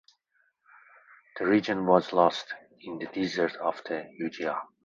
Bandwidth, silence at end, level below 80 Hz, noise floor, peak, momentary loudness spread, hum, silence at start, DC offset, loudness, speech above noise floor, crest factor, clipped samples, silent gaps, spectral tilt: 7.6 kHz; 0.2 s; -70 dBFS; -72 dBFS; -6 dBFS; 16 LU; none; 1.35 s; under 0.1%; -28 LUFS; 44 dB; 24 dB; under 0.1%; none; -6 dB/octave